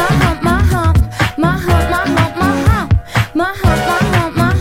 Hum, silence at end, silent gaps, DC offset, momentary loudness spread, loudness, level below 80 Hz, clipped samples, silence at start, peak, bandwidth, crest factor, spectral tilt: none; 0 s; none; under 0.1%; 2 LU; -14 LUFS; -22 dBFS; under 0.1%; 0 s; 0 dBFS; 16.5 kHz; 12 dB; -6 dB/octave